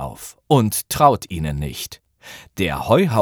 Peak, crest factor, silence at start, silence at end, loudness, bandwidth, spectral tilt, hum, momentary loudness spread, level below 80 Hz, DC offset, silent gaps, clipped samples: 0 dBFS; 20 dB; 0 s; 0 s; -19 LUFS; over 20 kHz; -5.5 dB/octave; none; 21 LU; -40 dBFS; under 0.1%; none; under 0.1%